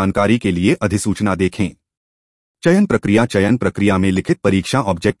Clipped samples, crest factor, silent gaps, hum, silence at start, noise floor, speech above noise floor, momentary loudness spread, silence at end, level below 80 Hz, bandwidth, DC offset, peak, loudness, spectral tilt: under 0.1%; 14 dB; 1.97-2.55 s; none; 0 s; under -90 dBFS; over 75 dB; 4 LU; 0.05 s; -46 dBFS; 12 kHz; under 0.1%; -2 dBFS; -16 LUFS; -6 dB/octave